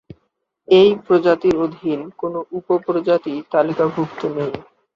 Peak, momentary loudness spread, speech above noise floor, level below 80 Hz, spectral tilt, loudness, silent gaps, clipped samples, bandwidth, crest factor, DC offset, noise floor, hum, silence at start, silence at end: -2 dBFS; 13 LU; 52 dB; -56 dBFS; -7.5 dB/octave; -18 LUFS; none; under 0.1%; 7.2 kHz; 18 dB; under 0.1%; -69 dBFS; none; 0.7 s; 0.35 s